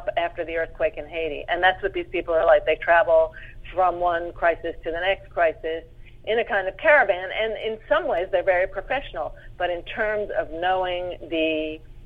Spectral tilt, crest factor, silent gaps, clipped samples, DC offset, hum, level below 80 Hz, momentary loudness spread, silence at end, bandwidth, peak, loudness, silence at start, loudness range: -6.5 dB/octave; 18 dB; none; under 0.1%; under 0.1%; none; -44 dBFS; 12 LU; 0 s; 4.8 kHz; -4 dBFS; -23 LUFS; 0 s; 4 LU